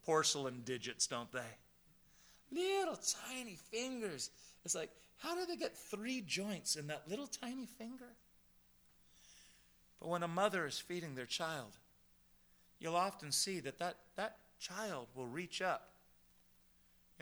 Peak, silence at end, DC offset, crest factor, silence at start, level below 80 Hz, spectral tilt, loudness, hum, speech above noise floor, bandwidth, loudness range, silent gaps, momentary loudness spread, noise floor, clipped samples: -20 dBFS; 1.3 s; under 0.1%; 24 dB; 0.05 s; -78 dBFS; -2.5 dB/octave; -41 LUFS; none; 28 dB; over 20 kHz; 4 LU; none; 14 LU; -70 dBFS; under 0.1%